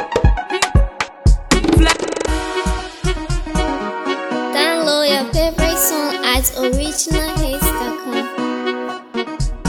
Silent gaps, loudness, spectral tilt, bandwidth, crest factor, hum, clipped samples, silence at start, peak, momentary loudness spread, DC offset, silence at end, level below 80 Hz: none; -18 LUFS; -4 dB/octave; 19 kHz; 16 dB; none; under 0.1%; 0 s; 0 dBFS; 8 LU; under 0.1%; 0 s; -22 dBFS